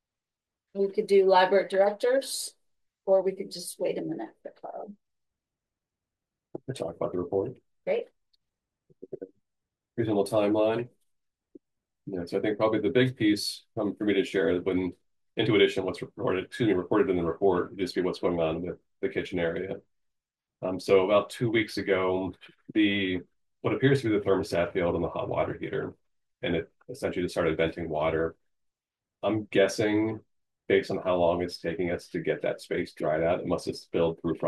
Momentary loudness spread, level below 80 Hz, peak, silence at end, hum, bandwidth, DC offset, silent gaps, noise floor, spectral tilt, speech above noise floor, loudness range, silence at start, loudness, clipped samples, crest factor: 14 LU; -64 dBFS; -8 dBFS; 0 s; none; 12.5 kHz; under 0.1%; none; under -90 dBFS; -5.5 dB/octave; over 63 dB; 8 LU; 0.75 s; -28 LUFS; under 0.1%; 20 dB